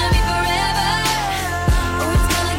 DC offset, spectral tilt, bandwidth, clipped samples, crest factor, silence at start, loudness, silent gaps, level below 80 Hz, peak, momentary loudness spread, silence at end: under 0.1%; -4 dB/octave; 16.5 kHz; under 0.1%; 10 dB; 0 s; -18 LUFS; none; -22 dBFS; -8 dBFS; 3 LU; 0 s